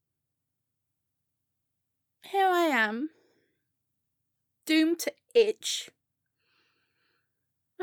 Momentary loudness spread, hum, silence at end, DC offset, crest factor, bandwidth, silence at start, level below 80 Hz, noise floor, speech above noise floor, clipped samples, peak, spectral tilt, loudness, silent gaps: 13 LU; none; 0 s; under 0.1%; 22 dB; over 20 kHz; 2.25 s; -90 dBFS; -84 dBFS; 57 dB; under 0.1%; -10 dBFS; -2 dB/octave; -27 LUFS; none